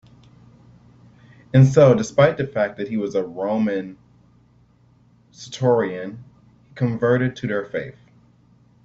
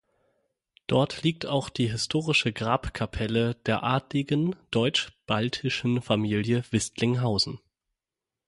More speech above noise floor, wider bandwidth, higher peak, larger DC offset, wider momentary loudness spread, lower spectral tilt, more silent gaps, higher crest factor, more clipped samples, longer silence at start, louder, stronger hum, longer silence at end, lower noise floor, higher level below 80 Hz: second, 37 dB vs 63 dB; second, 8 kHz vs 11.5 kHz; first, -2 dBFS vs -8 dBFS; neither; first, 20 LU vs 5 LU; first, -7.5 dB/octave vs -5 dB/octave; neither; about the same, 20 dB vs 20 dB; neither; first, 1.55 s vs 0.9 s; first, -20 LUFS vs -27 LUFS; neither; about the same, 0.95 s vs 0.9 s; second, -56 dBFS vs -89 dBFS; second, -56 dBFS vs -50 dBFS